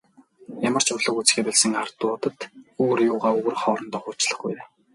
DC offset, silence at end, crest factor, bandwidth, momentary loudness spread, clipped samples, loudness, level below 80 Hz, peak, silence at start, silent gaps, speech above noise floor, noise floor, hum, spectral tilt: under 0.1%; 0.3 s; 22 dB; 11.5 kHz; 13 LU; under 0.1%; -22 LUFS; -72 dBFS; -2 dBFS; 0.5 s; none; 23 dB; -46 dBFS; none; -2.5 dB/octave